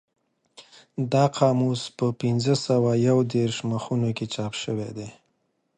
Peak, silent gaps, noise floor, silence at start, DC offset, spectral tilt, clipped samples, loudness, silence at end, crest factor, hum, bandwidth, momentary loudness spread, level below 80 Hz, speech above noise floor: -6 dBFS; none; -72 dBFS; 0.6 s; under 0.1%; -6.5 dB/octave; under 0.1%; -24 LUFS; 0.65 s; 18 dB; none; 9.6 kHz; 11 LU; -62 dBFS; 49 dB